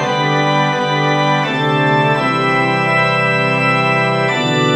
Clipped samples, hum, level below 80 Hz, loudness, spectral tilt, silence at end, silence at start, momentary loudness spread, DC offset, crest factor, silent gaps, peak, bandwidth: under 0.1%; none; -56 dBFS; -14 LUFS; -5.5 dB/octave; 0 s; 0 s; 2 LU; under 0.1%; 12 dB; none; -2 dBFS; 11 kHz